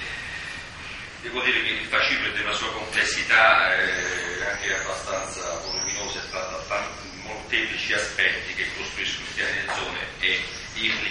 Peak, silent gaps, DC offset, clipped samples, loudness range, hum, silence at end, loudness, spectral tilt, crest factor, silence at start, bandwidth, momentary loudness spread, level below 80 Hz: -4 dBFS; none; under 0.1%; under 0.1%; 7 LU; none; 0 s; -24 LUFS; -1.5 dB/octave; 22 dB; 0 s; 11.5 kHz; 13 LU; -48 dBFS